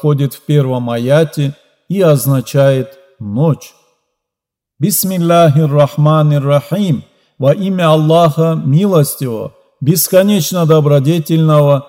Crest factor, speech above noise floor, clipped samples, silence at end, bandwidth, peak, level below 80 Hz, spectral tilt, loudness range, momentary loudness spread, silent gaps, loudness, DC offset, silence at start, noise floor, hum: 12 dB; 71 dB; 0.1%; 0.05 s; 16.5 kHz; 0 dBFS; -58 dBFS; -6.5 dB/octave; 4 LU; 10 LU; none; -12 LUFS; under 0.1%; 0.05 s; -82 dBFS; none